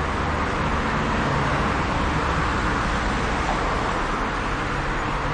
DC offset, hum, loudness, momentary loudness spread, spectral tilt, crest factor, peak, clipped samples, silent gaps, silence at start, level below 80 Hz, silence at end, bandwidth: under 0.1%; none; -23 LUFS; 3 LU; -5.5 dB/octave; 14 dB; -10 dBFS; under 0.1%; none; 0 s; -30 dBFS; 0 s; 10.5 kHz